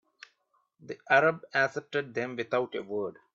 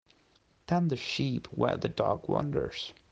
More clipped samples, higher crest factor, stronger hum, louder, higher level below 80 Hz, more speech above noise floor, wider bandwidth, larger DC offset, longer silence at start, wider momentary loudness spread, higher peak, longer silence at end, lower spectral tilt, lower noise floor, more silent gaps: neither; about the same, 24 dB vs 20 dB; neither; about the same, -29 LUFS vs -31 LUFS; second, -78 dBFS vs -58 dBFS; first, 44 dB vs 36 dB; about the same, 7.6 kHz vs 8 kHz; neither; first, 0.85 s vs 0.7 s; first, 12 LU vs 4 LU; first, -8 dBFS vs -12 dBFS; about the same, 0.2 s vs 0.2 s; about the same, -5.5 dB/octave vs -6.5 dB/octave; first, -73 dBFS vs -67 dBFS; neither